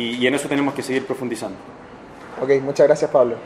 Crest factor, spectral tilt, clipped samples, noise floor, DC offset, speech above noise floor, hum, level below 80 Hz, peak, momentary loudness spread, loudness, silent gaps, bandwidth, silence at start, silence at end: 18 dB; -5 dB/octave; under 0.1%; -39 dBFS; under 0.1%; 20 dB; none; -60 dBFS; -2 dBFS; 23 LU; -20 LUFS; none; 13.5 kHz; 0 s; 0 s